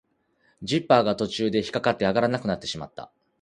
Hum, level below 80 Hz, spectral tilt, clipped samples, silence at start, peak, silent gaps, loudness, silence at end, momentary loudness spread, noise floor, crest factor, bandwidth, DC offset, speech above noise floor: none; -58 dBFS; -5.5 dB/octave; under 0.1%; 0.6 s; -4 dBFS; none; -24 LUFS; 0.35 s; 16 LU; -67 dBFS; 22 dB; 11 kHz; under 0.1%; 43 dB